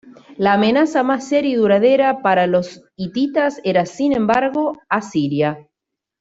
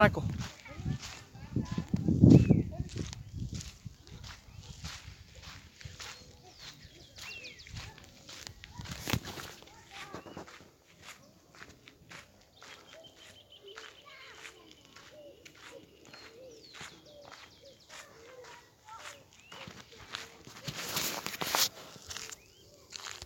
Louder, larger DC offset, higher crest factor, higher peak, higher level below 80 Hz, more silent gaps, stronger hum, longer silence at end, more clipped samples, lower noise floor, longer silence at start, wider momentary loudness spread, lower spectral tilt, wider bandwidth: first, -17 LUFS vs -33 LUFS; neither; second, 14 dB vs 30 dB; about the same, -2 dBFS vs -4 dBFS; second, -58 dBFS vs -52 dBFS; neither; neither; first, 0.6 s vs 0 s; neither; first, -82 dBFS vs -59 dBFS; about the same, 0.05 s vs 0 s; second, 8 LU vs 21 LU; about the same, -6 dB/octave vs -5 dB/octave; second, 8 kHz vs 17 kHz